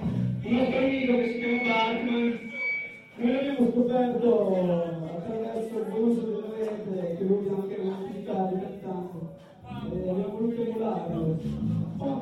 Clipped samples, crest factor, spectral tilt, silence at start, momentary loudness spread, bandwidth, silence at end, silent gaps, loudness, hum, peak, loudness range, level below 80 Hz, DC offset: under 0.1%; 16 dB; -8 dB/octave; 0 s; 11 LU; 9.8 kHz; 0 s; none; -28 LUFS; none; -12 dBFS; 5 LU; -56 dBFS; under 0.1%